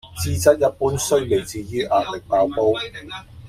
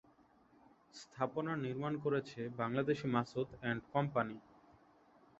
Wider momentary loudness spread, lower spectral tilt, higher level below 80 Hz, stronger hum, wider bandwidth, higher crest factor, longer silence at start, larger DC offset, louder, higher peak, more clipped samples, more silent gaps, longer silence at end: about the same, 11 LU vs 12 LU; second, -4.5 dB/octave vs -6 dB/octave; first, -44 dBFS vs -72 dBFS; neither; first, 16 kHz vs 8 kHz; about the same, 18 dB vs 22 dB; second, 0.05 s vs 0.95 s; neither; first, -20 LUFS vs -39 LUFS; first, -2 dBFS vs -18 dBFS; neither; neither; second, 0 s vs 1 s